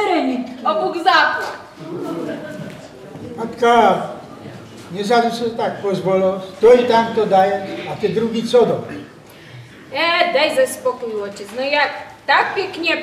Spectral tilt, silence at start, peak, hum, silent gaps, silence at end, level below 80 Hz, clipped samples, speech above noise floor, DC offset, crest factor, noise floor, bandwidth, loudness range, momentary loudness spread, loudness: -4.5 dB/octave; 0 s; 0 dBFS; none; none; 0 s; -58 dBFS; under 0.1%; 24 dB; under 0.1%; 18 dB; -40 dBFS; 14.5 kHz; 4 LU; 19 LU; -17 LUFS